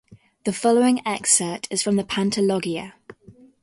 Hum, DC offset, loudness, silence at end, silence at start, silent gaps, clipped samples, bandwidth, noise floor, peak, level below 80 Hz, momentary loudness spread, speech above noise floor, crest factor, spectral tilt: none; under 0.1%; -21 LUFS; 0.3 s; 0.1 s; none; under 0.1%; 11.5 kHz; -50 dBFS; -4 dBFS; -62 dBFS; 11 LU; 29 dB; 18 dB; -3.5 dB/octave